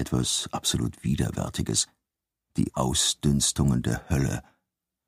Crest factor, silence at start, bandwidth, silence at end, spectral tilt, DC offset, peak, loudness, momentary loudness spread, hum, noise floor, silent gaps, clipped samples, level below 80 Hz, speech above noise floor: 18 dB; 0 s; 15.5 kHz; 0.65 s; -4 dB/octave; under 0.1%; -10 dBFS; -26 LUFS; 7 LU; none; -86 dBFS; none; under 0.1%; -42 dBFS; 60 dB